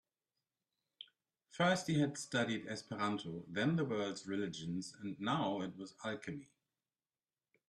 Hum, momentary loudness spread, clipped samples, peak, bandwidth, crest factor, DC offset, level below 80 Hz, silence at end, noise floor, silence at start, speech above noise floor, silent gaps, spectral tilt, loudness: none; 15 LU; under 0.1%; -20 dBFS; 12.5 kHz; 20 dB; under 0.1%; -78 dBFS; 1.25 s; under -90 dBFS; 1 s; over 52 dB; none; -5 dB/octave; -39 LUFS